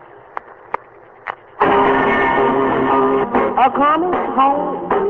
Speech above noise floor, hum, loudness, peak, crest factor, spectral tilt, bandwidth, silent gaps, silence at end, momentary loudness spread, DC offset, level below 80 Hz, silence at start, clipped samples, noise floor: 27 dB; none; -15 LUFS; -2 dBFS; 16 dB; -8 dB/octave; 4.6 kHz; none; 0 s; 18 LU; under 0.1%; -46 dBFS; 0.45 s; under 0.1%; -42 dBFS